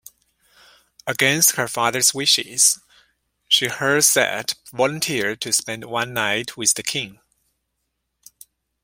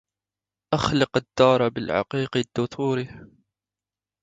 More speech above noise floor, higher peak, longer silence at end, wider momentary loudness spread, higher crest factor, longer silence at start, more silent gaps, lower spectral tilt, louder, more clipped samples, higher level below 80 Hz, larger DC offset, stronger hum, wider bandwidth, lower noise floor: second, 55 dB vs over 67 dB; first, 0 dBFS vs -4 dBFS; first, 1.7 s vs 1 s; first, 12 LU vs 9 LU; about the same, 22 dB vs 22 dB; first, 1.05 s vs 0.7 s; neither; second, -1 dB/octave vs -6 dB/octave; first, -18 LUFS vs -23 LUFS; neither; second, -64 dBFS vs -54 dBFS; neither; second, none vs 50 Hz at -55 dBFS; first, 16.5 kHz vs 9.2 kHz; second, -76 dBFS vs under -90 dBFS